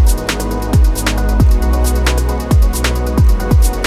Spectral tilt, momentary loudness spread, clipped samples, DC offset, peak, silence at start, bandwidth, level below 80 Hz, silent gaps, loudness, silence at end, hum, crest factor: -5.5 dB/octave; 4 LU; under 0.1%; under 0.1%; 0 dBFS; 0 s; 15 kHz; -12 dBFS; none; -14 LUFS; 0 s; none; 12 dB